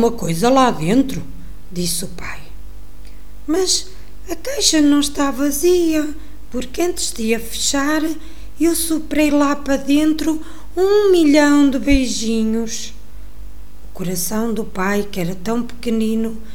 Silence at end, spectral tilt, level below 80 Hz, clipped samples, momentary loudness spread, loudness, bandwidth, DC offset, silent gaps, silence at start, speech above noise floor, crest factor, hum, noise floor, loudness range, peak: 0.05 s; -4 dB/octave; -36 dBFS; under 0.1%; 15 LU; -17 LUFS; 18 kHz; 6%; none; 0 s; 21 dB; 18 dB; 50 Hz at -40 dBFS; -38 dBFS; 7 LU; 0 dBFS